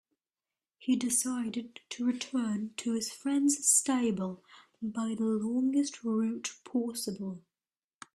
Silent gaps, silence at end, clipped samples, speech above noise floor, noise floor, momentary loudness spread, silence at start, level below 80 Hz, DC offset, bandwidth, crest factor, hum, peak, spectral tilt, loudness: none; 0.8 s; under 0.1%; over 59 dB; under -90 dBFS; 15 LU; 0.8 s; -76 dBFS; under 0.1%; 14.5 kHz; 20 dB; none; -12 dBFS; -3.5 dB/octave; -31 LUFS